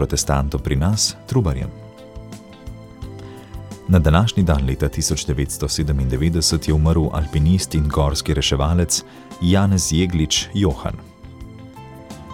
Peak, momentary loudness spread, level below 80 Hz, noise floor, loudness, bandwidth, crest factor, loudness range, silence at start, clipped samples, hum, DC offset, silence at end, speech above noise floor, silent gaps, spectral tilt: -2 dBFS; 21 LU; -28 dBFS; -38 dBFS; -19 LUFS; 16.5 kHz; 18 dB; 4 LU; 0 s; under 0.1%; none; under 0.1%; 0 s; 20 dB; none; -5 dB/octave